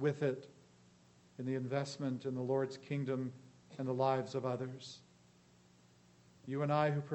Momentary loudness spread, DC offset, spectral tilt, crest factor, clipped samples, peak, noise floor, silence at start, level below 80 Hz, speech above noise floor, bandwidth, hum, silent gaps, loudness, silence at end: 20 LU; under 0.1%; -7 dB/octave; 20 dB; under 0.1%; -20 dBFS; -66 dBFS; 0 s; -82 dBFS; 29 dB; 8.4 kHz; 60 Hz at -70 dBFS; none; -38 LUFS; 0 s